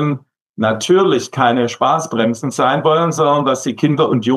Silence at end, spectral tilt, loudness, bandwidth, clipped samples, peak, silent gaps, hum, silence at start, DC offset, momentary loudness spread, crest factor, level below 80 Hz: 0 s; -5.5 dB/octave; -15 LUFS; 13.5 kHz; under 0.1%; -2 dBFS; 0.41-0.54 s; none; 0 s; under 0.1%; 5 LU; 12 dB; -70 dBFS